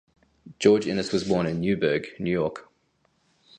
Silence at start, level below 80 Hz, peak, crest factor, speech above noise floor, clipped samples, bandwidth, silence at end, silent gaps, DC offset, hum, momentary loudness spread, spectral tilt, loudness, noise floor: 0.45 s; -56 dBFS; -4 dBFS; 22 dB; 45 dB; under 0.1%; 9.6 kHz; 0.95 s; none; under 0.1%; none; 7 LU; -6 dB/octave; -25 LUFS; -69 dBFS